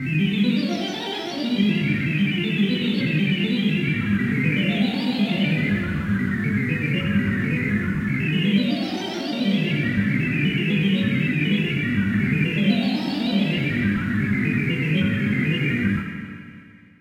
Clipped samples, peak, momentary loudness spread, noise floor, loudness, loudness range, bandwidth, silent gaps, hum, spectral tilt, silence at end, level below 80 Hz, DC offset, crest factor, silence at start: under 0.1%; -8 dBFS; 4 LU; -45 dBFS; -22 LUFS; 1 LU; 12 kHz; none; none; -7 dB/octave; 0.35 s; -48 dBFS; under 0.1%; 14 dB; 0 s